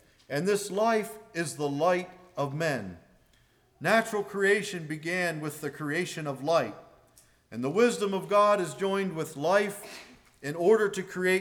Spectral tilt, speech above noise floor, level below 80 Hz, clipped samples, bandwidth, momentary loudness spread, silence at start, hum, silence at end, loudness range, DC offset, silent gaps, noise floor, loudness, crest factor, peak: -5 dB/octave; 37 dB; -70 dBFS; under 0.1%; 19.5 kHz; 12 LU; 0.3 s; none; 0 s; 3 LU; under 0.1%; none; -64 dBFS; -28 LUFS; 18 dB; -10 dBFS